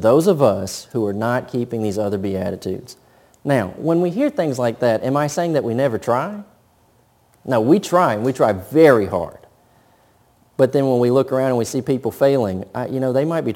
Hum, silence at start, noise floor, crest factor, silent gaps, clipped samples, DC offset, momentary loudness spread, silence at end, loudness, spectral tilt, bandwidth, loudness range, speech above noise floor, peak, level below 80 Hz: none; 0 s; -57 dBFS; 18 dB; none; under 0.1%; under 0.1%; 11 LU; 0 s; -19 LUFS; -6.5 dB/octave; 17 kHz; 4 LU; 39 dB; 0 dBFS; -58 dBFS